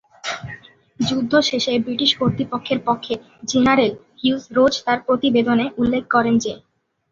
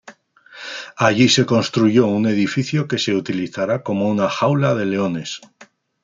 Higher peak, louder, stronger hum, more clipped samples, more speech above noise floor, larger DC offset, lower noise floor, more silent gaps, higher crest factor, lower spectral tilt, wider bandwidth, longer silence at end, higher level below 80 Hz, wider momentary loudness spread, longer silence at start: about the same, -2 dBFS vs -2 dBFS; about the same, -19 LUFS vs -18 LUFS; neither; neither; second, 22 dB vs 28 dB; neither; second, -40 dBFS vs -45 dBFS; neither; about the same, 18 dB vs 16 dB; about the same, -4.5 dB/octave vs -5.5 dB/octave; second, 7.6 kHz vs 9.4 kHz; first, 0.55 s vs 0.4 s; first, -52 dBFS vs -60 dBFS; second, 11 LU vs 16 LU; first, 0.25 s vs 0.05 s